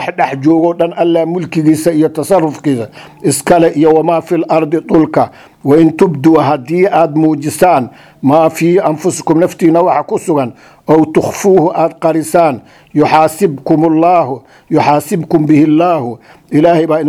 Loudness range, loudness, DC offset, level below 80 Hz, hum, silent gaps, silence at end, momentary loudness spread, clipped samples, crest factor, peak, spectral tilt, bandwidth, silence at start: 2 LU; -11 LUFS; under 0.1%; -50 dBFS; none; none; 0 s; 7 LU; 0.4%; 10 dB; 0 dBFS; -6.5 dB/octave; 15 kHz; 0 s